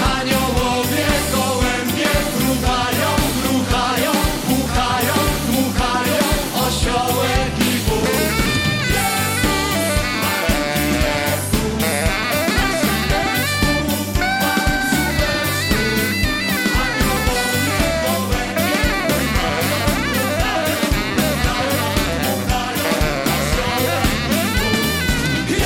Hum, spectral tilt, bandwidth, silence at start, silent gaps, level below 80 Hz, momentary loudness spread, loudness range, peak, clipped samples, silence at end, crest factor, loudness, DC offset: none; -4 dB/octave; 17 kHz; 0 s; none; -28 dBFS; 2 LU; 1 LU; -6 dBFS; under 0.1%; 0 s; 12 dB; -18 LUFS; under 0.1%